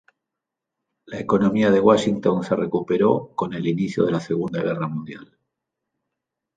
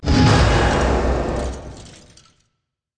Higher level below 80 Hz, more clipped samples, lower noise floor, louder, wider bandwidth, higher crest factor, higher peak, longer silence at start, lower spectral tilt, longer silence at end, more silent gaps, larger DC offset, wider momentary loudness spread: second, -58 dBFS vs -24 dBFS; neither; first, -84 dBFS vs -75 dBFS; second, -21 LUFS vs -18 LUFS; about the same, 9.2 kHz vs 10 kHz; about the same, 20 dB vs 16 dB; about the same, -4 dBFS vs -2 dBFS; first, 1.1 s vs 0 s; about the same, -7 dB/octave vs -6 dB/octave; first, 1.35 s vs 1.1 s; neither; neither; second, 14 LU vs 21 LU